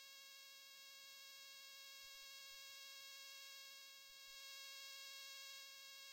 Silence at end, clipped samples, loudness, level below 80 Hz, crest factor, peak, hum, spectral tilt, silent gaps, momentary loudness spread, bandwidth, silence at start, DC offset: 0 s; under 0.1%; -56 LUFS; under -90 dBFS; 16 dB; -42 dBFS; none; 3.5 dB/octave; none; 5 LU; 16 kHz; 0 s; under 0.1%